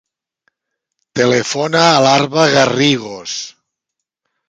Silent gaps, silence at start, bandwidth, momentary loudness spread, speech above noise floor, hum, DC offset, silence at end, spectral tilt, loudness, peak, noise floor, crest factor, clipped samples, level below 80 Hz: none; 1.15 s; 9.4 kHz; 14 LU; 66 dB; none; under 0.1%; 1 s; -4 dB/octave; -13 LUFS; 0 dBFS; -79 dBFS; 16 dB; under 0.1%; -56 dBFS